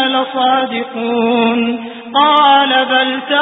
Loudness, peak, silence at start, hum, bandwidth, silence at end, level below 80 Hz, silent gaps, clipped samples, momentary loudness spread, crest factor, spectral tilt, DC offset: -12 LUFS; 0 dBFS; 0 s; none; 4 kHz; 0 s; -62 dBFS; none; under 0.1%; 10 LU; 12 dB; -6.5 dB/octave; under 0.1%